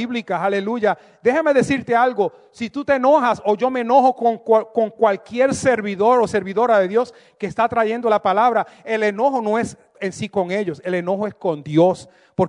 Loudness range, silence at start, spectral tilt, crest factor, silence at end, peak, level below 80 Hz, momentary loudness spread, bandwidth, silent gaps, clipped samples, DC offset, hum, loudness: 3 LU; 0 s; -6 dB/octave; 14 dB; 0 s; -4 dBFS; -60 dBFS; 9 LU; 11 kHz; none; under 0.1%; under 0.1%; none; -19 LUFS